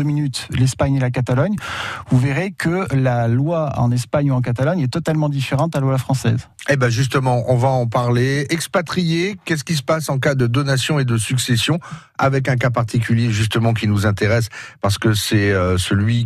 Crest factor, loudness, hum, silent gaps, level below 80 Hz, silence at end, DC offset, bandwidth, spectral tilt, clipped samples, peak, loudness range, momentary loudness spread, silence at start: 14 dB; -18 LUFS; none; none; -44 dBFS; 0 s; under 0.1%; 14 kHz; -6 dB/octave; under 0.1%; -4 dBFS; 1 LU; 4 LU; 0 s